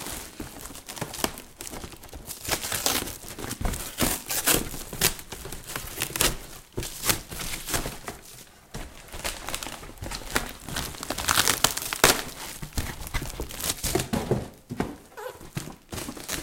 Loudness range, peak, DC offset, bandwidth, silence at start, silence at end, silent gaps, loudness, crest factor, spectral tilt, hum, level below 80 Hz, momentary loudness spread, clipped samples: 7 LU; 0 dBFS; under 0.1%; 17 kHz; 0 s; 0 s; none; -28 LUFS; 30 dB; -2 dB/octave; none; -42 dBFS; 17 LU; under 0.1%